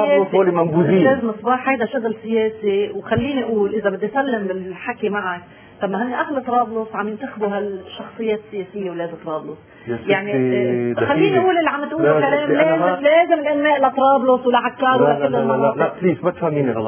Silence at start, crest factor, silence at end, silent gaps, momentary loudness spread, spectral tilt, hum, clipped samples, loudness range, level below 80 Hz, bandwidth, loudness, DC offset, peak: 0 s; 16 dB; 0 s; none; 12 LU; -10 dB/octave; none; under 0.1%; 8 LU; -54 dBFS; 3.5 kHz; -18 LUFS; under 0.1%; -2 dBFS